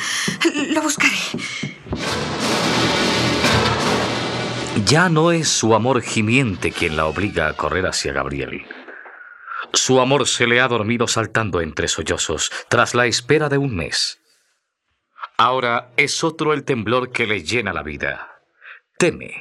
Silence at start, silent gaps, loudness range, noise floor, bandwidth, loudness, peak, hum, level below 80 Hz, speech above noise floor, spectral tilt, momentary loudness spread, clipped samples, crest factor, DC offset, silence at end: 0 s; none; 4 LU; -72 dBFS; 14.5 kHz; -18 LUFS; 0 dBFS; none; -46 dBFS; 54 dB; -3.5 dB/octave; 10 LU; under 0.1%; 18 dB; under 0.1%; 0 s